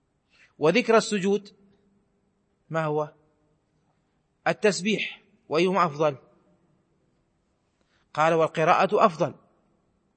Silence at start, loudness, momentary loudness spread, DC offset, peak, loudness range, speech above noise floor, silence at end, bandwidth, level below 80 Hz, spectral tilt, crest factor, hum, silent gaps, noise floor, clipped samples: 0.6 s; -24 LUFS; 10 LU; under 0.1%; -4 dBFS; 5 LU; 48 dB; 0.85 s; 8.8 kHz; -76 dBFS; -5 dB/octave; 22 dB; none; none; -71 dBFS; under 0.1%